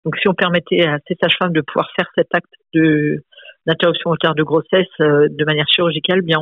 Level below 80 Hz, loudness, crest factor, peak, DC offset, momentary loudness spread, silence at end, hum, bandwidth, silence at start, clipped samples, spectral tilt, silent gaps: -58 dBFS; -16 LUFS; 14 dB; -2 dBFS; under 0.1%; 6 LU; 0 s; none; 4.9 kHz; 0.05 s; under 0.1%; -8 dB/octave; none